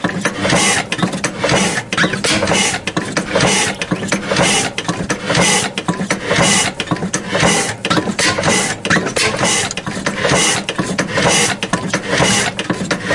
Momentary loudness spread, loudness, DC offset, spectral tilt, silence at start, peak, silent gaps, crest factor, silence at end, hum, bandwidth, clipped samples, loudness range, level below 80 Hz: 7 LU; -15 LUFS; under 0.1%; -3 dB/octave; 0 s; 0 dBFS; none; 16 dB; 0 s; none; 11.5 kHz; under 0.1%; 1 LU; -42 dBFS